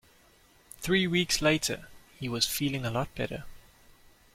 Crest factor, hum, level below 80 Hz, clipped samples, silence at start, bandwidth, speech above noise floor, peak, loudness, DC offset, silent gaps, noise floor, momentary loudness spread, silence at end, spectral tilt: 22 dB; none; -52 dBFS; under 0.1%; 0.8 s; 16.5 kHz; 32 dB; -8 dBFS; -29 LUFS; under 0.1%; none; -61 dBFS; 14 LU; 0.75 s; -3.5 dB/octave